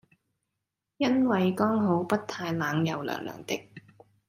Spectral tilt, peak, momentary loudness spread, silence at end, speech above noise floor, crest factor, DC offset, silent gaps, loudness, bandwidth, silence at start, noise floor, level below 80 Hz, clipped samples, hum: -6.5 dB/octave; -12 dBFS; 11 LU; 0.5 s; 58 dB; 18 dB; under 0.1%; none; -28 LUFS; 15.5 kHz; 1 s; -85 dBFS; -70 dBFS; under 0.1%; none